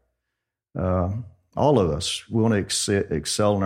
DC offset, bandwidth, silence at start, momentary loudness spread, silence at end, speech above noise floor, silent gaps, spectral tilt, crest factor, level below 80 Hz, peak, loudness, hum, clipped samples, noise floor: under 0.1%; 16 kHz; 0.75 s; 10 LU; 0 s; 61 dB; none; -5 dB/octave; 18 dB; -46 dBFS; -6 dBFS; -23 LUFS; none; under 0.1%; -83 dBFS